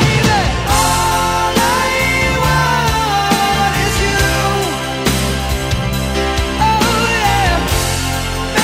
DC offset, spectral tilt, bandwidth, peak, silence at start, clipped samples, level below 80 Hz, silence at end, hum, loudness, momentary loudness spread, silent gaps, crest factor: under 0.1%; -4 dB/octave; 16 kHz; 0 dBFS; 0 s; under 0.1%; -24 dBFS; 0 s; none; -14 LUFS; 5 LU; none; 14 dB